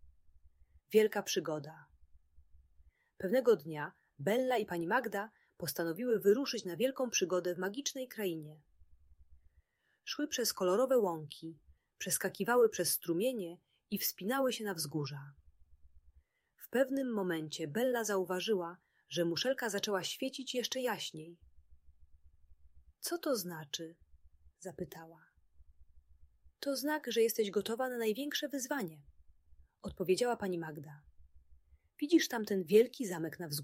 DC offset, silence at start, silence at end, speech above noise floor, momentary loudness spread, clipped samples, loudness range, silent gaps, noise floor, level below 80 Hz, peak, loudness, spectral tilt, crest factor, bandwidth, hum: under 0.1%; 0.05 s; 0 s; 38 dB; 16 LU; under 0.1%; 9 LU; none; -73 dBFS; -70 dBFS; -16 dBFS; -35 LUFS; -3.5 dB/octave; 22 dB; 16 kHz; none